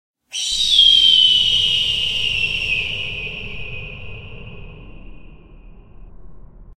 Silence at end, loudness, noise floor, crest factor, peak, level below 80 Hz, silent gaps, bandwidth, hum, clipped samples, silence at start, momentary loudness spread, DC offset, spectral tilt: 0.15 s; -13 LUFS; -41 dBFS; 18 dB; -2 dBFS; -40 dBFS; none; 15.5 kHz; none; under 0.1%; 0.3 s; 24 LU; under 0.1%; 0 dB/octave